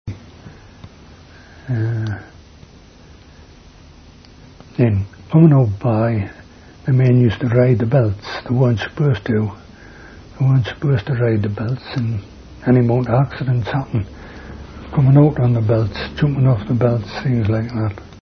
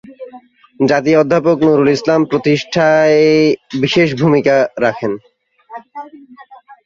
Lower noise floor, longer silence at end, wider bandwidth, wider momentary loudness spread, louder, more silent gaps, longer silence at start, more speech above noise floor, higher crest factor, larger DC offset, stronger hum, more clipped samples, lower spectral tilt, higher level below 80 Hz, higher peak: about the same, -43 dBFS vs -41 dBFS; about the same, 0.1 s vs 0.1 s; second, 6.4 kHz vs 7.4 kHz; second, 15 LU vs 20 LU; second, -17 LUFS vs -13 LUFS; neither; about the same, 0.05 s vs 0.05 s; about the same, 27 dB vs 28 dB; about the same, 18 dB vs 14 dB; neither; neither; neither; first, -9.5 dB/octave vs -6 dB/octave; first, -42 dBFS vs -54 dBFS; about the same, 0 dBFS vs 0 dBFS